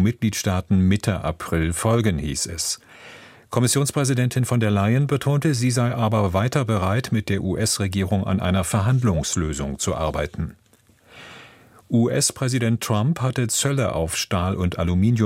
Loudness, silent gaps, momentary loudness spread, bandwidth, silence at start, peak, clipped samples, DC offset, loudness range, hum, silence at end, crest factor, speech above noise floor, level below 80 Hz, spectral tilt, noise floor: -22 LUFS; none; 6 LU; 16.5 kHz; 0 s; -4 dBFS; under 0.1%; under 0.1%; 4 LU; none; 0 s; 16 dB; 35 dB; -40 dBFS; -5 dB/octave; -56 dBFS